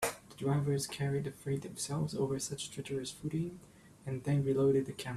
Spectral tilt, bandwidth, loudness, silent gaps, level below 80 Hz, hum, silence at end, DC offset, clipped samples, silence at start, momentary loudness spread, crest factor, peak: -5.5 dB/octave; 14.5 kHz; -35 LUFS; none; -64 dBFS; none; 0 s; under 0.1%; under 0.1%; 0 s; 10 LU; 16 dB; -20 dBFS